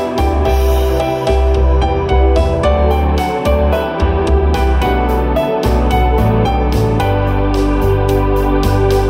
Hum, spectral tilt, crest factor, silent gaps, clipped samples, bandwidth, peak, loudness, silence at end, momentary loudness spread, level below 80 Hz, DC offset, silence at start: none; -7 dB/octave; 10 dB; none; under 0.1%; 16 kHz; -2 dBFS; -14 LUFS; 0 s; 2 LU; -16 dBFS; under 0.1%; 0 s